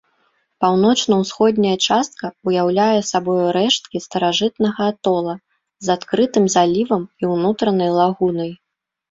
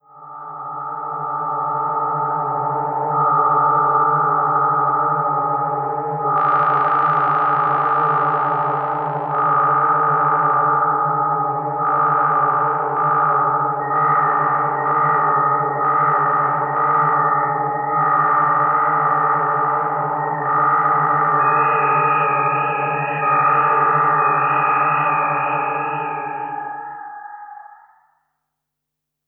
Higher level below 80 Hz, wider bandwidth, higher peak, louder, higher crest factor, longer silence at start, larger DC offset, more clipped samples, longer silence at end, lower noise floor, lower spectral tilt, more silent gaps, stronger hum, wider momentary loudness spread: first, -60 dBFS vs -84 dBFS; first, 7.8 kHz vs 4.1 kHz; about the same, -2 dBFS vs -4 dBFS; about the same, -18 LUFS vs -17 LUFS; about the same, 16 dB vs 14 dB; first, 0.6 s vs 0.15 s; neither; neither; second, 0.55 s vs 1.55 s; second, -64 dBFS vs -80 dBFS; second, -4.5 dB/octave vs -10 dB/octave; neither; neither; about the same, 7 LU vs 8 LU